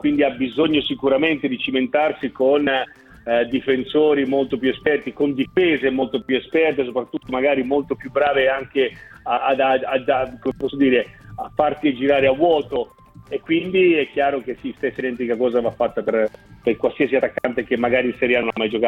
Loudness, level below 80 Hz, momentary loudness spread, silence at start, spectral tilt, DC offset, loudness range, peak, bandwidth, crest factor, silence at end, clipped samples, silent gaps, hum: -20 LUFS; -52 dBFS; 9 LU; 0.05 s; -7 dB/octave; under 0.1%; 2 LU; -4 dBFS; 5.6 kHz; 16 dB; 0 s; under 0.1%; none; none